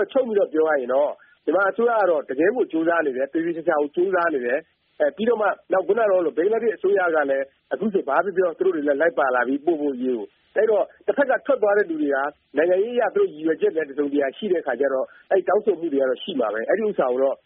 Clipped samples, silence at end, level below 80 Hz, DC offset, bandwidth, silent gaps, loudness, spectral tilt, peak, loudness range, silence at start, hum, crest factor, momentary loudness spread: under 0.1%; 0.1 s; -72 dBFS; under 0.1%; 3.9 kHz; none; -22 LUFS; -3.5 dB/octave; -4 dBFS; 1 LU; 0 s; none; 16 dB; 5 LU